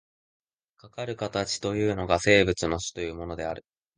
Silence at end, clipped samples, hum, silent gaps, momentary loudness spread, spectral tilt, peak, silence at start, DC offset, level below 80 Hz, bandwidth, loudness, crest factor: 0.35 s; under 0.1%; none; none; 15 LU; -4.5 dB/octave; -4 dBFS; 0.85 s; under 0.1%; -48 dBFS; 10 kHz; -26 LUFS; 24 dB